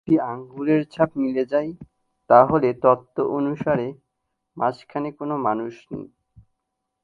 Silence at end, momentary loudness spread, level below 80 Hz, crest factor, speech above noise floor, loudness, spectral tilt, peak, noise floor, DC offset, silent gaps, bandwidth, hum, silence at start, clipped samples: 1 s; 16 LU; -58 dBFS; 22 dB; 57 dB; -22 LUFS; -9 dB/octave; 0 dBFS; -79 dBFS; under 0.1%; none; 7.2 kHz; none; 0.05 s; under 0.1%